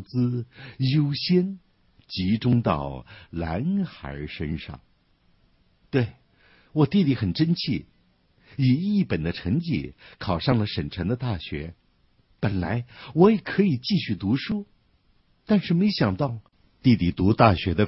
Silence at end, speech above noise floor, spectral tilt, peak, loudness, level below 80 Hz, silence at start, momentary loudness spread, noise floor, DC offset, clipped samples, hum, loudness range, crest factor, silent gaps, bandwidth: 0 s; 40 dB; -10.5 dB/octave; -2 dBFS; -24 LUFS; -48 dBFS; 0 s; 15 LU; -63 dBFS; under 0.1%; under 0.1%; none; 5 LU; 22 dB; none; 6 kHz